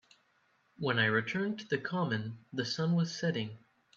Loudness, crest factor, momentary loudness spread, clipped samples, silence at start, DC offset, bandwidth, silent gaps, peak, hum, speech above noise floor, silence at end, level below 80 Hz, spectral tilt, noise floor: -33 LUFS; 20 dB; 9 LU; under 0.1%; 0.8 s; under 0.1%; 7.4 kHz; none; -16 dBFS; none; 39 dB; 0.4 s; -74 dBFS; -5.5 dB/octave; -72 dBFS